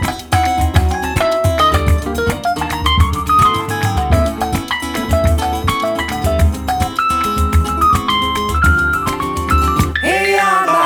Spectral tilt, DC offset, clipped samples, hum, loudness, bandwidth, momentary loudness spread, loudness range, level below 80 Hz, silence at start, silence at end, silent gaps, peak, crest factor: -5 dB/octave; under 0.1%; under 0.1%; none; -15 LUFS; 19 kHz; 6 LU; 2 LU; -22 dBFS; 0 s; 0 s; none; 0 dBFS; 14 dB